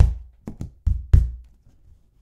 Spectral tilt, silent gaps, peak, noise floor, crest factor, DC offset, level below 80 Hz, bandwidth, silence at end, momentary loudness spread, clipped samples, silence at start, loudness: -9 dB/octave; none; 0 dBFS; -53 dBFS; 22 dB; under 0.1%; -24 dBFS; 3.3 kHz; 0.8 s; 20 LU; under 0.1%; 0 s; -23 LUFS